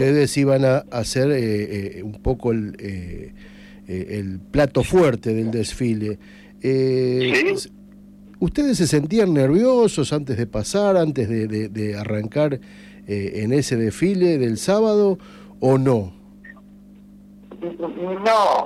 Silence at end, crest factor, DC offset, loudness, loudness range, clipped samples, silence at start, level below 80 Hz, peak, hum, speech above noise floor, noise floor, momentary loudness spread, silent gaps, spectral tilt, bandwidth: 0 s; 14 dB; under 0.1%; -20 LUFS; 5 LU; under 0.1%; 0 s; -44 dBFS; -6 dBFS; 50 Hz at -45 dBFS; 25 dB; -45 dBFS; 13 LU; none; -6 dB/octave; 14 kHz